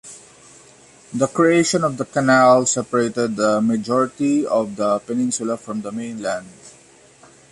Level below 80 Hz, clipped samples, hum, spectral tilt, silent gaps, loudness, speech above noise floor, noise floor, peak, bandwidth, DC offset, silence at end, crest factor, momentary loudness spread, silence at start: -60 dBFS; under 0.1%; none; -4.5 dB/octave; none; -19 LUFS; 31 dB; -49 dBFS; -2 dBFS; 11.5 kHz; under 0.1%; 0.8 s; 18 dB; 13 LU; 0.05 s